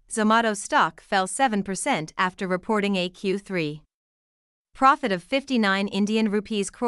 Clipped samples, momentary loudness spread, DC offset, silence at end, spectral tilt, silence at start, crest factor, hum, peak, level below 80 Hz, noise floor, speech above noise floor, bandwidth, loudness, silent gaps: under 0.1%; 8 LU; under 0.1%; 0 s; -4 dB/octave; 0.1 s; 20 dB; none; -6 dBFS; -60 dBFS; under -90 dBFS; over 66 dB; 12 kHz; -24 LUFS; 3.94-4.65 s